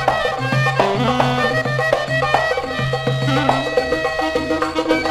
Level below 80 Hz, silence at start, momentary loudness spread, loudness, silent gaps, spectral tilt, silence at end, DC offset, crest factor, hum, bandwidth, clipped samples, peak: -40 dBFS; 0 s; 3 LU; -18 LUFS; none; -5.5 dB/octave; 0 s; under 0.1%; 18 dB; none; 14.5 kHz; under 0.1%; 0 dBFS